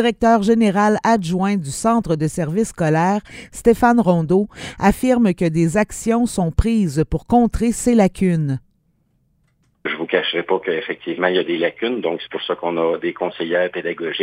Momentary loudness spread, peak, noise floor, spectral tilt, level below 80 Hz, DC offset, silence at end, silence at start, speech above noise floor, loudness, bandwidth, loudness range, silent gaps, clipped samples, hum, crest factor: 9 LU; -2 dBFS; -63 dBFS; -6 dB/octave; -36 dBFS; under 0.1%; 0 s; 0 s; 45 dB; -18 LUFS; 16 kHz; 4 LU; none; under 0.1%; none; 16 dB